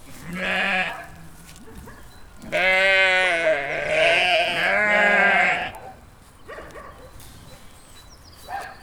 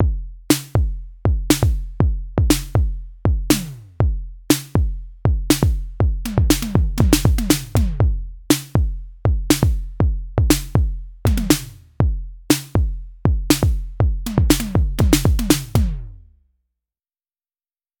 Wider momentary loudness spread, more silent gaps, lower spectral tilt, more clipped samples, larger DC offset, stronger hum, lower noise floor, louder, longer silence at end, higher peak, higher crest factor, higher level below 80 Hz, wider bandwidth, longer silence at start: first, 23 LU vs 7 LU; neither; second, -3 dB/octave vs -5.5 dB/octave; neither; neither; neither; second, -47 dBFS vs under -90 dBFS; about the same, -19 LUFS vs -20 LUFS; second, 0.05 s vs 1.85 s; second, -4 dBFS vs 0 dBFS; about the same, 18 dB vs 18 dB; second, -50 dBFS vs -22 dBFS; about the same, over 20 kHz vs 19.5 kHz; about the same, 0.05 s vs 0 s